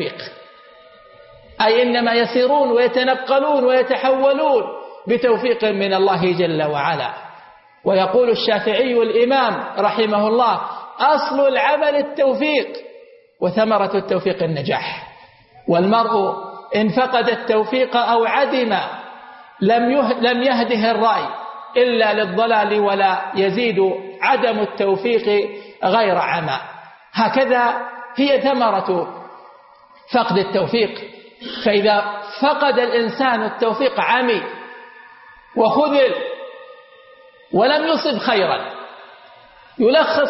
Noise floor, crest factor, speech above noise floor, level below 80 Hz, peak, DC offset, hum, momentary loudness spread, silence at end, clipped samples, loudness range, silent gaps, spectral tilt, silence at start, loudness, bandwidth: -47 dBFS; 16 dB; 31 dB; -64 dBFS; -2 dBFS; under 0.1%; none; 12 LU; 0 s; under 0.1%; 3 LU; none; -8.5 dB/octave; 0 s; -17 LUFS; 5.8 kHz